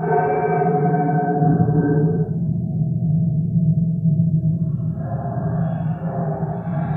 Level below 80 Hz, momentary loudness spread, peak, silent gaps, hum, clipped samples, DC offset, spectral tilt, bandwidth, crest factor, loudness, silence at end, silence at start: -44 dBFS; 7 LU; -4 dBFS; none; none; under 0.1%; under 0.1%; -13.5 dB/octave; 2.5 kHz; 14 dB; -20 LUFS; 0 s; 0 s